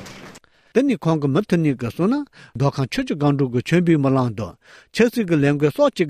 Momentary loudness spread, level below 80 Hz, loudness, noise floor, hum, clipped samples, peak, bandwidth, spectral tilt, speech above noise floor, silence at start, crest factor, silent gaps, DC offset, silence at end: 11 LU; -52 dBFS; -20 LUFS; -45 dBFS; none; under 0.1%; -4 dBFS; 15 kHz; -7 dB/octave; 26 dB; 0 s; 16 dB; none; under 0.1%; 0 s